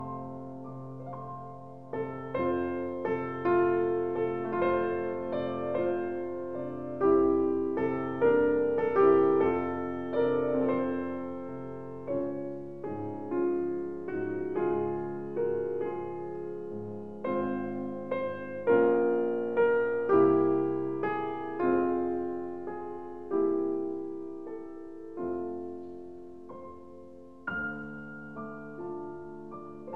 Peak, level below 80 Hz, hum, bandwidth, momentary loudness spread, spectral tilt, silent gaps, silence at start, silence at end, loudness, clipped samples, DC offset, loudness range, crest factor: -12 dBFS; -64 dBFS; none; 4.3 kHz; 17 LU; -9.5 dB/octave; none; 0 s; 0 s; -30 LUFS; under 0.1%; 0.4%; 13 LU; 18 dB